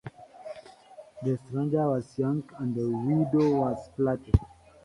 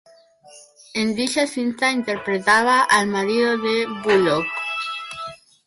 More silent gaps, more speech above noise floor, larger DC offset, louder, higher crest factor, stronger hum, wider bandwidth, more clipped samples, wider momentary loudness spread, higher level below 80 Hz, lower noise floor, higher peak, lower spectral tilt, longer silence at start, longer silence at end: neither; second, 24 dB vs 30 dB; neither; second, -28 LUFS vs -20 LUFS; first, 22 dB vs 16 dB; neither; about the same, 11 kHz vs 11.5 kHz; neither; first, 20 LU vs 13 LU; first, -42 dBFS vs -60 dBFS; about the same, -50 dBFS vs -49 dBFS; about the same, -6 dBFS vs -4 dBFS; first, -9.5 dB/octave vs -3.5 dB/octave; second, 0.05 s vs 0.55 s; about the same, 0.4 s vs 0.3 s